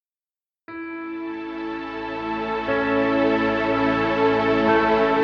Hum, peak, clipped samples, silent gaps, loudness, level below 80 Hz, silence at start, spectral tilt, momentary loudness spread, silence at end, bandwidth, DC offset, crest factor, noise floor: none; -6 dBFS; under 0.1%; none; -22 LUFS; -48 dBFS; 0.7 s; -7 dB/octave; 13 LU; 0 s; 7 kHz; under 0.1%; 16 dB; under -90 dBFS